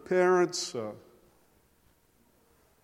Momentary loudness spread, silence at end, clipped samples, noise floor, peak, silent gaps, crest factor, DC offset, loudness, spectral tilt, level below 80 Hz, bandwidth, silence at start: 18 LU; 1.85 s; under 0.1%; -66 dBFS; -12 dBFS; none; 20 dB; under 0.1%; -28 LUFS; -4.5 dB/octave; -74 dBFS; 12.5 kHz; 0.05 s